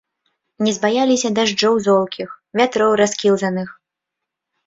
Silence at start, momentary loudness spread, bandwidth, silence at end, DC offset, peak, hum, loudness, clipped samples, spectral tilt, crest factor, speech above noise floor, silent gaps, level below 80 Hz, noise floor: 0.6 s; 10 LU; 7.8 kHz; 0.95 s; under 0.1%; -2 dBFS; none; -17 LUFS; under 0.1%; -4 dB/octave; 16 dB; 65 dB; none; -62 dBFS; -82 dBFS